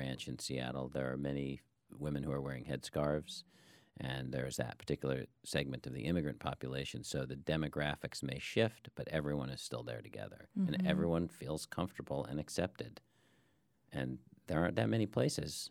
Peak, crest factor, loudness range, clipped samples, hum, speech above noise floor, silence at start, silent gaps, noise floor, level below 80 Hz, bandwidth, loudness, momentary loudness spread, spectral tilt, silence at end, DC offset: -16 dBFS; 24 dB; 3 LU; under 0.1%; none; 36 dB; 0 s; none; -75 dBFS; -60 dBFS; 17 kHz; -39 LUFS; 10 LU; -5.5 dB/octave; 0 s; under 0.1%